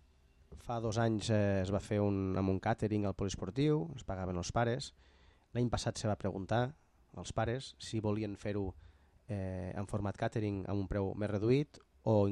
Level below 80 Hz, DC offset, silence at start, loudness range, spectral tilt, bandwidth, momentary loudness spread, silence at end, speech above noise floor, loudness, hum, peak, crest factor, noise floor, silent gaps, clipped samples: -56 dBFS; under 0.1%; 0.5 s; 5 LU; -6.5 dB/octave; 11 kHz; 9 LU; 0 s; 31 dB; -36 LUFS; none; -18 dBFS; 16 dB; -66 dBFS; none; under 0.1%